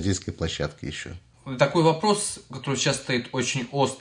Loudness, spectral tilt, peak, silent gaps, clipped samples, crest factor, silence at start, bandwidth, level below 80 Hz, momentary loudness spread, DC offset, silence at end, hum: -25 LUFS; -4 dB/octave; -6 dBFS; none; under 0.1%; 20 dB; 0 s; 11 kHz; -52 dBFS; 14 LU; under 0.1%; 0 s; none